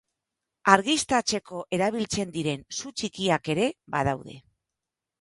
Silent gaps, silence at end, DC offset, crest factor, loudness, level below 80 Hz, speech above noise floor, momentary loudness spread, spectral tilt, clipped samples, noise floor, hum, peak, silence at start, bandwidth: none; 0.8 s; under 0.1%; 26 dB; -26 LUFS; -58 dBFS; 61 dB; 12 LU; -3.5 dB/octave; under 0.1%; -87 dBFS; none; -2 dBFS; 0.65 s; 11.5 kHz